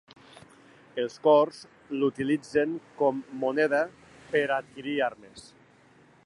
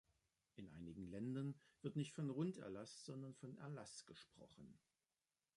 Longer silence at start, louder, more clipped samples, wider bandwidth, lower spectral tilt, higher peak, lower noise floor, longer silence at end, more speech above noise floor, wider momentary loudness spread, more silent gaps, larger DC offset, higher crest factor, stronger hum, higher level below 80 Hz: first, 0.95 s vs 0.55 s; first, -27 LUFS vs -51 LUFS; neither; about the same, 11 kHz vs 11.5 kHz; about the same, -5.5 dB/octave vs -6.5 dB/octave; first, -10 dBFS vs -34 dBFS; second, -58 dBFS vs under -90 dBFS; about the same, 0.85 s vs 0.8 s; second, 31 dB vs over 40 dB; second, 13 LU vs 17 LU; neither; neither; about the same, 20 dB vs 18 dB; neither; first, -70 dBFS vs -80 dBFS